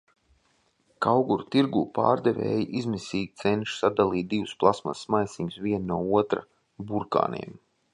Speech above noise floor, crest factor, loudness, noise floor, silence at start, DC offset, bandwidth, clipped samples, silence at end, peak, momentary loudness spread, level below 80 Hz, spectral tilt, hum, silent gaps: 42 dB; 22 dB; -26 LUFS; -68 dBFS; 1 s; under 0.1%; 11 kHz; under 0.1%; 0.35 s; -4 dBFS; 8 LU; -58 dBFS; -6.5 dB/octave; none; none